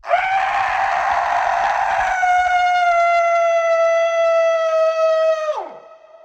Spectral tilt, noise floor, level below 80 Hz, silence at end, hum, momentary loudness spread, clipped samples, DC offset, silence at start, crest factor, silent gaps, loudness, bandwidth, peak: -1 dB/octave; -42 dBFS; -52 dBFS; 0.3 s; none; 3 LU; under 0.1%; under 0.1%; 0.05 s; 12 dB; none; -17 LUFS; 8.4 kHz; -4 dBFS